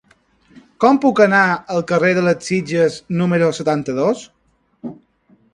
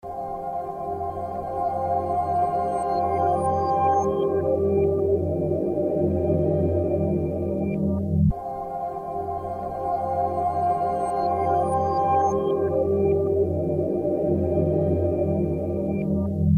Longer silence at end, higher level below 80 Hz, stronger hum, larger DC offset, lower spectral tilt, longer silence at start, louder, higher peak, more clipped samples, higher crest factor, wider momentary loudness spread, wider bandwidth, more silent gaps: first, 0.6 s vs 0 s; second, -58 dBFS vs -42 dBFS; neither; neither; second, -6 dB/octave vs -9.5 dB/octave; first, 0.8 s vs 0.05 s; first, -16 LUFS vs -24 LUFS; first, 0 dBFS vs -10 dBFS; neither; about the same, 18 dB vs 14 dB; first, 14 LU vs 8 LU; about the same, 11 kHz vs 10 kHz; neither